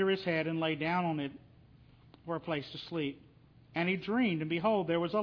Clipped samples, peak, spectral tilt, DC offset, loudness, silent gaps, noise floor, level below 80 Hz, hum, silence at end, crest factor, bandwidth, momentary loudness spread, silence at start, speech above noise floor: under 0.1%; -16 dBFS; -8 dB/octave; under 0.1%; -33 LUFS; none; -59 dBFS; -68 dBFS; none; 0 s; 18 dB; 5.4 kHz; 10 LU; 0 s; 27 dB